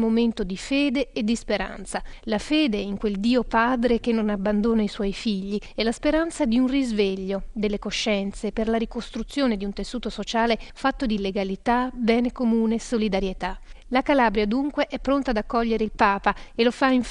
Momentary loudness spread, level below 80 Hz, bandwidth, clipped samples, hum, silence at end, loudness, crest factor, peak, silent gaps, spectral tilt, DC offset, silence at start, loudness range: 8 LU; -40 dBFS; 11 kHz; under 0.1%; none; 0 s; -24 LUFS; 20 dB; -4 dBFS; none; -5 dB/octave; under 0.1%; 0 s; 3 LU